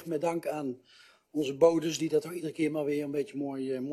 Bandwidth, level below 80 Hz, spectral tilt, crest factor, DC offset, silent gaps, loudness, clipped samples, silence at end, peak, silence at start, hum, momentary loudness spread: 13.5 kHz; -76 dBFS; -5.5 dB/octave; 22 dB; under 0.1%; none; -31 LUFS; under 0.1%; 0 s; -10 dBFS; 0 s; none; 12 LU